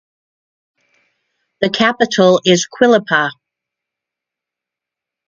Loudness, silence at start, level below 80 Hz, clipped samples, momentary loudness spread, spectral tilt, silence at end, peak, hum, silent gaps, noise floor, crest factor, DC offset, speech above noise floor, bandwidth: -13 LUFS; 1.6 s; -60 dBFS; under 0.1%; 8 LU; -4 dB/octave; 1.95 s; 0 dBFS; none; none; -85 dBFS; 18 dB; under 0.1%; 72 dB; 7.6 kHz